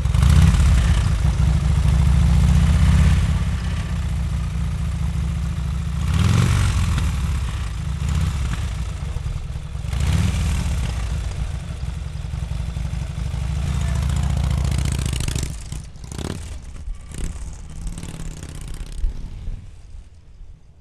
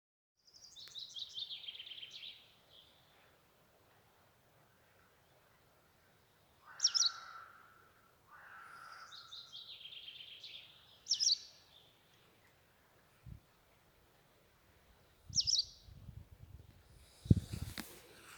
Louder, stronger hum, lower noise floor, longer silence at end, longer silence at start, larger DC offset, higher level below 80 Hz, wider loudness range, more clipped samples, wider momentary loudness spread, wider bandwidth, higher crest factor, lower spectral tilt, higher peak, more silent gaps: first, -22 LUFS vs -37 LUFS; neither; second, -41 dBFS vs -70 dBFS; first, 0.25 s vs 0 s; second, 0 s vs 0.55 s; first, 0.3% vs under 0.1%; first, -22 dBFS vs -60 dBFS; about the same, 15 LU vs 14 LU; neither; second, 18 LU vs 27 LU; second, 13 kHz vs over 20 kHz; second, 18 dB vs 34 dB; first, -6 dB/octave vs -2.5 dB/octave; first, -2 dBFS vs -12 dBFS; neither